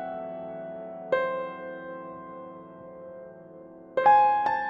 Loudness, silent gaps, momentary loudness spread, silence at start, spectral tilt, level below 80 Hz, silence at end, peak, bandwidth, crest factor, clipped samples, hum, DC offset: -26 LUFS; none; 25 LU; 0 s; -6.5 dB/octave; -70 dBFS; 0 s; -8 dBFS; 5.8 kHz; 20 dB; under 0.1%; none; under 0.1%